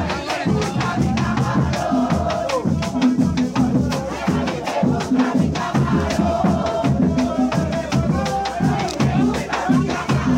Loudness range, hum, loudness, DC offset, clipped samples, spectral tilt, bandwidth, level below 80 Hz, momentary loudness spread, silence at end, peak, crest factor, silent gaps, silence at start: 1 LU; none; -20 LUFS; under 0.1%; under 0.1%; -6.5 dB/octave; 15.5 kHz; -36 dBFS; 3 LU; 0 s; -6 dBFS; 12 dB; none; 0 s